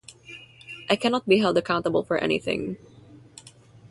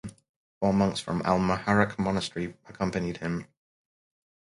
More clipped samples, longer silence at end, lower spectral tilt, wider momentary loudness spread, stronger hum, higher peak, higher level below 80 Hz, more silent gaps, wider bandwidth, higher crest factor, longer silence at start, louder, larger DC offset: neither; second, 0.05 s vs 1.15 s; about the same, -5.5 dB/octave vs -6 dB/octave; first, 22 LU vs 11 LU; neither; about the same, -6 dBFS vs -6 dBFS; second, -58 dBFS vs -52 dBFS; second, none vs 0.29-0.61 s; about the same, 11.5 kHz vs 11.5 kHz; about the same, 20 dB vs 22 dB; about the same, 0.1 s vs 0.05 s; first, -24 LUFS vs -28 LUFS; neither